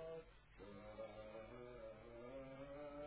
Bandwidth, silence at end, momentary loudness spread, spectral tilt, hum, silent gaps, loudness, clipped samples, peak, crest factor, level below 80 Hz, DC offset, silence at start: 4 kHz; 0 s; 5 LU; -5.5 dB/octave; none; none; -56 LUFS; under 0.1%; -42 dBFS; 14 dB; -70 dBFS; under 0.1%; 0 s